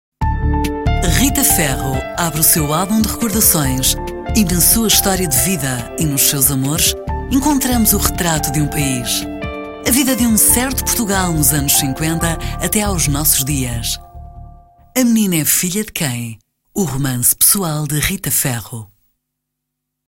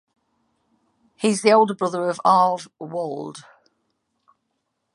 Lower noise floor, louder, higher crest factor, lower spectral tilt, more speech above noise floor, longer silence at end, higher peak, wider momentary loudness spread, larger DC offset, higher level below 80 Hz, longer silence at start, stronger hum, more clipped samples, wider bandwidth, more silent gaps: about the same, -77 dBFS vs -75 dBFS; first, -14 LUFS vs -20 LUFS; second, 16 dB vs 22 dB; about the same, -3.5 dB/octave vs -4.5 dB/octave; first, 61 dB vs 55 dB; second, 1.25 s vs 1.55 s; about the same, 0 dBFS vs -2 dBFS; second, 10 LU vs 16 LU; neither; first, -28 dBFS vs -76 dBFS; second, 0.2 s vs 1.2 s; neither; neither; first, 16.5 kHz vs 11.5 kHz; neither